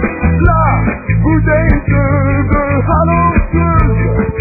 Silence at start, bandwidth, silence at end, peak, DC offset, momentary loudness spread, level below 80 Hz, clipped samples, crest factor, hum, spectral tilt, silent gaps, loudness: 0 s; 2.6 kHz; 0 s; 0 dBFS; under 0.1%; 3 LU; -18 dBFS; under 0.1%; 10 dB; none; -13.5 dB/octave; none; -12 LUFS